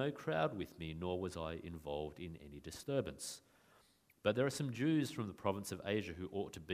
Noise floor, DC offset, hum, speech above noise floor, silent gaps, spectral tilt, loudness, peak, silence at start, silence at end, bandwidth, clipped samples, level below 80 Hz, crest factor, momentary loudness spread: -71 dBFS; under 0.1%; none; 31 dB; none; -5.5 dB/octave; -41 LUFS; -18 dBFS; 0 s; 0 s; 15.5 kHz; under 0.1%; -64 dBFS; 22 dB; 12 LU